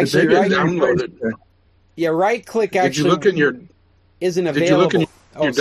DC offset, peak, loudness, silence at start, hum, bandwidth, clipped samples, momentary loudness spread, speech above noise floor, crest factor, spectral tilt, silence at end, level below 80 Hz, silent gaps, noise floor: under 0.1%; -2 dBFS; -18 LUFS; 0 s; none; 14 kHz; under 0.1%; 11 LU; 39 dB; 16 dB; -5.5 dB/octave; 0 s; -56 dBFS; none; -56 dBFS